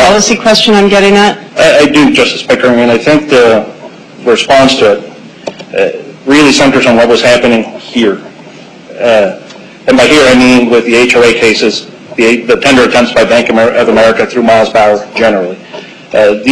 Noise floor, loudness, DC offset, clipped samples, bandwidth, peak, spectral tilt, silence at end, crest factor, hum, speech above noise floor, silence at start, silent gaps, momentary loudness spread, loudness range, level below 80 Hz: -30 dBFS; -6 LUFS; under 0.1%; 0.6%; 13.5 kHz; 0 dBFS; -4 dB/octave; 0 s; 6 dB; none; 24 dB; 0 s; none; 12 LU; 3 LU; -38 dBFS